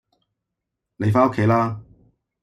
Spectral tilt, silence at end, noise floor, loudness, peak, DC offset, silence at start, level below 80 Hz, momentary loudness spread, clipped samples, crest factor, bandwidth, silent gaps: -9 dB/octave; 0.6 s; -82 dBFS; -20 LUFS; -4 dBFS; under 0.1%; 1 s; -58 dBFS; 9 LU; under 0.1%; 18 dB; 10 kHz; none